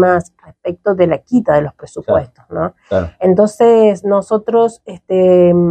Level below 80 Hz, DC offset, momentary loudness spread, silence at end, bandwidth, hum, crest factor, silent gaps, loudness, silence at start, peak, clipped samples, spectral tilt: -44 dBFS; under 0.1%; 15 LU; 0 s; 9.6 kHz; none; 12 dB; none; -13 LUFS; 0 s; 0 dBFS; under 0.1%; -8 dB/octave